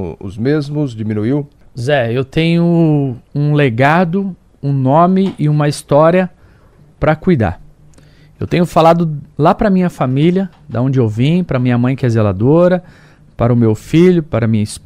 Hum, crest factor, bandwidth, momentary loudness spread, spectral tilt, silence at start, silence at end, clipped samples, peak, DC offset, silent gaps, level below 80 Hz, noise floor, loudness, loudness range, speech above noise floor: none; 14 dB; 12.5 kHz; 9 LU; -8 dB/octave; 0 s; 0.05 s; under 0.1%; 0 dBFS; under 0.1%; none; -40 dBFS; -45 dBFS; -13 LUFS; 2 LU; 32 dB